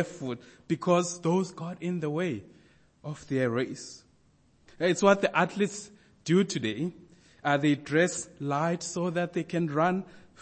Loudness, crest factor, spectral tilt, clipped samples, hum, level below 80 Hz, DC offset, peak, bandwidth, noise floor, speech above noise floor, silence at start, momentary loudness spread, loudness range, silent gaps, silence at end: -28 LUFS; 22 dB; -5.5 dB/octave; under 0.1%; none; -68 dBFS; under 0.1%; -8 dBFS; 8.8 kHz; -64 dBFS; 36 dB; 0 s; 16 LU; 5 LU; none; 0.25 s